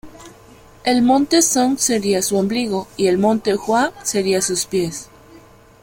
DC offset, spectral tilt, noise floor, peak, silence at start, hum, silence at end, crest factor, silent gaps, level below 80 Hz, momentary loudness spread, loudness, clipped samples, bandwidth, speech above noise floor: under 0.1%; -3.5 dB/octave; -45 dBFS; -4 dBFS; 0.05 s; none; 0.45 s; 16 dB; none; -52 dBFS; 8 LU; -17 LUFS; under 0.1%; 16.5 kHz; 28 dB